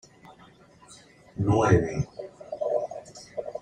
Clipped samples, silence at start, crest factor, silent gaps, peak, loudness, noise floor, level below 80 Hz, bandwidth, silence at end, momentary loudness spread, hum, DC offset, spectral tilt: under 0.1%; 0.25 s; 22 dB; none; -6 dBFS; -27 LUFS; -54 dBFS; -50 dBFS; 10 kHz; 0 s; 20 LU; none; under 0.1%; -7.5 dB/octave